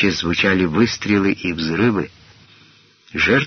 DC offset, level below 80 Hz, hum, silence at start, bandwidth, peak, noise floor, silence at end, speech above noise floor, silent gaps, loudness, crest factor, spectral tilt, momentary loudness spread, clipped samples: under 0.1%; -44 dBFS; none; 0 s; 6.6 kHz; -4 dBFS; -51 dBFS; 0 s; 33 dB; none; -18 LUFS; 16 dB; -4 dB/octave; 8 LU; under 0.1%